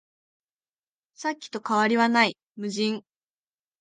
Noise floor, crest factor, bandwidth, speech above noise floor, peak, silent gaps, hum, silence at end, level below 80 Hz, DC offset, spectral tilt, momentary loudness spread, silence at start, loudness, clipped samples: under -90 dBFS; 20 dB; 9.6 kHz; over 65 dB; -8 dBFS; 2.43-2.47 s; none; 0.8 s; -78 dBFS; under 0.1%; -4 dB/octave; 13 LU; 1.2 s; -25 LUFS; under 0.1%